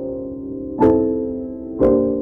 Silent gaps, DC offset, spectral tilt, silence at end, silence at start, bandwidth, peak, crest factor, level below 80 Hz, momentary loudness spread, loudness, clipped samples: none; under 0.1%; -11 dB/octave; 0 s; 0 s; 3.9 kHz; -4 dBFS; 14 dB; -40 dBFS; 13 LU; -19 LUFS; under 0.1%